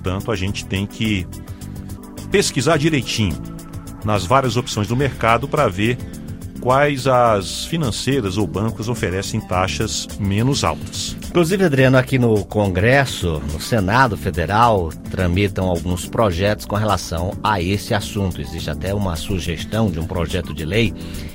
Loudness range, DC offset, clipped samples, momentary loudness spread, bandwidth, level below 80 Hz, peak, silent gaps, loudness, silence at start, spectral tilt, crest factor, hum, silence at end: 4 LU; under 0.1%; under 0.1%; 10 LU; 16.5 kHz; -36 dBFS; 0 dBFS; none; -19 LUFS; 0 s; -5.5 dB/octave; 18 dB; none; 0 s